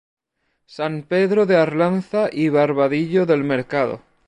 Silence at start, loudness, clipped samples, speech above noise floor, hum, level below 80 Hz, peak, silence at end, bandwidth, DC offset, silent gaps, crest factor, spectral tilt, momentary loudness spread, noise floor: 0.7 s; -19 LUFS; under 0.1%; 53 dB; none; -64 dBFS; -4 dBFS; 0.3 s; 10 kHz; under 0.1%; none; 16 dB; -8 dB/octave; 8 LU; -71 dBFS